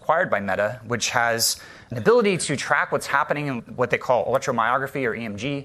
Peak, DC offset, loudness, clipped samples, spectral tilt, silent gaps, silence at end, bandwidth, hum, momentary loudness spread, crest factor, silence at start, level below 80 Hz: -4 dBFS; under 0.1%; -22 LUFS; under 0.1%; -3.5 dB/octave; none; 0 s; 14 kHz; none; 7 LU; 20 dB; 0 s; -60 dBFS